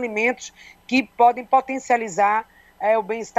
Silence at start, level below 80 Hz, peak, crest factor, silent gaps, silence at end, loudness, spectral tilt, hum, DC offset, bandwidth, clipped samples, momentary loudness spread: 0 s; -64 dBFS; -4 dBFS; 16 dB; none; 0.1 s; -21 LUFS; -3.5 dB/octave; none; under 0.1%; 12.5 kHz; under 0.1%; 8 LU